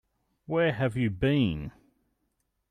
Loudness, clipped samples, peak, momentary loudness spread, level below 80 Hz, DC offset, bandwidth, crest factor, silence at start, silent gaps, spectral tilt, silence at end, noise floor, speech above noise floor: -28 LUFS; under 0.1%; -14 dBFS; 10 LU; -50 dBFS; under 0.1%; 10.5 kHz; 16 dB; 0.5 s; none; -8 dB/octave; 1 s; -77 dBFS; 51 dB